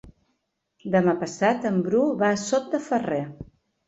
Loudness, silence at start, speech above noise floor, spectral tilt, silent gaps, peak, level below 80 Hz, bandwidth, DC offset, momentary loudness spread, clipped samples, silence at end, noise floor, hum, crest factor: -24 LUFS; 0.05 s; 52 dB; -6 dB/octave; none; -8 dBFS; -60 dBFS; 8.2 kHz; under 0.1%; 10 LU; under 0.1%; 0.45 s; -75 dBFS; none; 18 dB